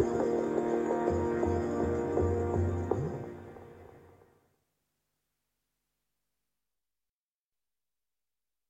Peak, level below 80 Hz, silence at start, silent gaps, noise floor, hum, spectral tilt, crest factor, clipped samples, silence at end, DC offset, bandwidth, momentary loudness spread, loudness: -14 dBFS; -52 dBFS; 0 s; none; under -90 dBFS; none; -8.5 dB/octave; 20 dB; under 0.1%; 4.7 s; under 0.1%; 8.4 kHz; 16 LU; -31 LUFS